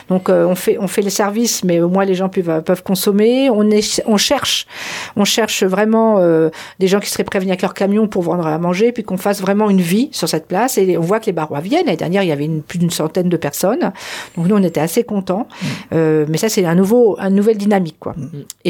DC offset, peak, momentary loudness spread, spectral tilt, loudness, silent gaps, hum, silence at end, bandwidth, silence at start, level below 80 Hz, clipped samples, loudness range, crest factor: under 0.1%; -2 dBFS; 7 LU; -5 dB/octave; -15 LUFS; none; none; 0 s; 18 kHz; 0.1 s; -56 dBFS; under 0.1%; 3 LU; 12 dB